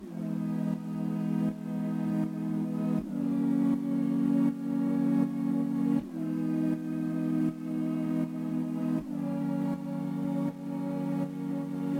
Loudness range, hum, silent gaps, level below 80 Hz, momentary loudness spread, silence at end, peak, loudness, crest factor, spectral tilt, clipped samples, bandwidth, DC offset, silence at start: 4 LU; none; none; -66 dBFS; 6 LU; 0 s; -16 dBFS; -31 LUFS; 14 dB; -9 dB/octave; under 0.1%; 16.5 kHz; under 0.1%; 0 s